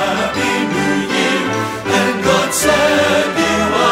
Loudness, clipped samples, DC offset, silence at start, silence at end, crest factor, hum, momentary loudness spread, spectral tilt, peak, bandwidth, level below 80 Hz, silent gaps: -14 LUFS; under 0.1%; under 0.1%; 0 s; 0 s; 14 dB; none; 4 LU; -3.5 dB/octave; -2 dBFS; 16 kHz; -42 dBFS; none